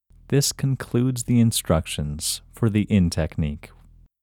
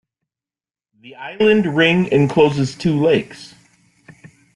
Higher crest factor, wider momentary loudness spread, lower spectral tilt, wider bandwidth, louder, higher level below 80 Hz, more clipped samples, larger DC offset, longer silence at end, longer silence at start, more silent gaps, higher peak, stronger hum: about the same, 18 dB vs 16 dB; second, 8 LU vs 20 LU; about the same, -5.5 dB/octave vs -6.5 dB/octave; first, 18.5 kHz vs 11.5 kHz; second, -23 LUFS vs -16 LUFS; first, -40 dBFS vs -54 dBFS; neither; neither; second, 0.55 s vs 1.1 s; second, 0.3 s vs 1.05 s; neither; second, -6 dBFS vs -2 dBFS; neither